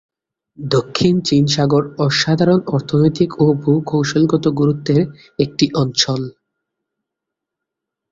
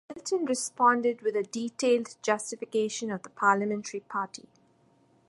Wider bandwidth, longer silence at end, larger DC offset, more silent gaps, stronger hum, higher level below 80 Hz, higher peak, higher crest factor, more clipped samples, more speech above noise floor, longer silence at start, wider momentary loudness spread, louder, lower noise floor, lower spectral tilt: second, 7.8 kHz vs 11.5 kHz; first, 1.8 s vs 0.9 s; neither; neither; neither; first, -50 dBFS vs -78 dBFS; first, 0 dBFS vs -10 dBFS; about the same, 16 dB vs 20 dB; neither; first, 66 dB vs 36 dB; first, 0.6 s vs 0.1 s; second, 5 LU vs 10 LU; first, -16 LUFS vs -29 LUFS; first, -82 dBFS vs -64 dBFS; first, -6 dB/octave vs -3.5 dB/octave